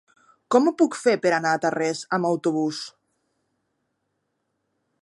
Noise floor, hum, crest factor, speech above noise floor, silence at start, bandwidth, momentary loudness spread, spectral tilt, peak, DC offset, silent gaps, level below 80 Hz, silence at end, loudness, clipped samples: -76 dBFS; none; 22 dB; 54 dB; 0.5 s; 11.5 kHz; 7 LU; -5 dB/octave; -4 dBFS; under 0.1%; none; -80 dBFS; 2.15 s; -22 LUFS; under 0.1%